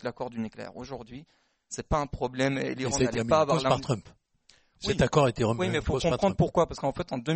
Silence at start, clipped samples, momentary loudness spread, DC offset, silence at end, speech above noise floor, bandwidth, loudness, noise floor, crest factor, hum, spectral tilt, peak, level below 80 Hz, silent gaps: 0.05 s; under 0.1%; 16 LU; under 0.1%; 0 s; 36 dB; 8.8 kHz; -27 LUFS; -63 dBFS; 20 dB; none; -5.5 dB/octave; -8 dBFS; -46 dBFS; none